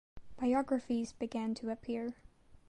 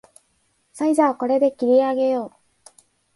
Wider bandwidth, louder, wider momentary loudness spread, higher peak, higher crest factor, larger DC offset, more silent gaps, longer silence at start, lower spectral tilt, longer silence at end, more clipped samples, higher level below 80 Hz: about the same, 10.5 kHz vs 11.5 kHz; second, -37 LUFS vs -20 LUFS; about the same, 7 LU vs 8 LU; second, -22 dBFS vs -6 dBFS; about the same, 16 dB vs 16 dB; neither; neither; second, 0.15 s vs 0.75 s; about the same, -6 dB/octave vs -5 dB/octave; second, 0.1 s vs 0.85 s; neither; first, -64 dBFS vs -70 dBFS